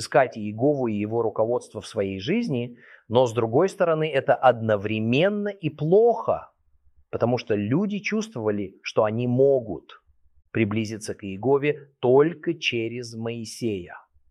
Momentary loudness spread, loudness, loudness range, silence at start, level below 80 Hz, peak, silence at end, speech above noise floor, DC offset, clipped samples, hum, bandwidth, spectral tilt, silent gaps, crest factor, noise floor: 12 LU; -24 LUFS; 3 LU; 0 s; -64 dBFS; -4 dBFS; 0.3 s; 36 dB; under 0.1%; under 0.1%; none; 12 kHz; -6.5 dB/octave; none; 20 dB; -59 dBFS